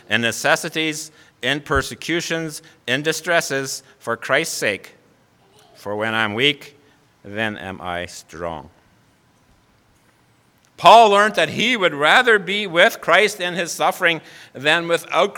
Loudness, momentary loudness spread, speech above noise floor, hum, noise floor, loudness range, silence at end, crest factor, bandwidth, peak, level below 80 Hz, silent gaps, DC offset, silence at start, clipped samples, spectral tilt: -18 LUFS; 16 LU; 39 dB; none; -57 dBFS; 16 LU; 0 s; 20 dB; 19 kHz; 0 dBFS; -50 dBFS; none; under 0.1%; 0.1 s; under 0.1%; -3 dB/octave